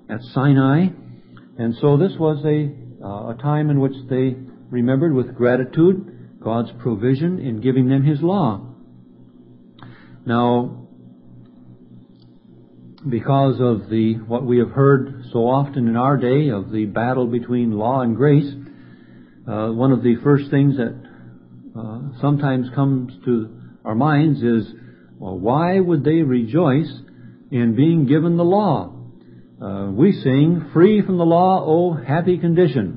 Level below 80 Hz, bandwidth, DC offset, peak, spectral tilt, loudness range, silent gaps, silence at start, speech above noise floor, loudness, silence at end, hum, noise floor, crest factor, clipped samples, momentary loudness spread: -54 dBFS; 5 kHz; under 0.1%; -2 dBFS; -13.5 dB/octave; 6 LU; none; 0.1 s; 30 dB; -18 LUFS; 0 s; none; -47 dBFS; 18 dB; under 0.1%; 14 LU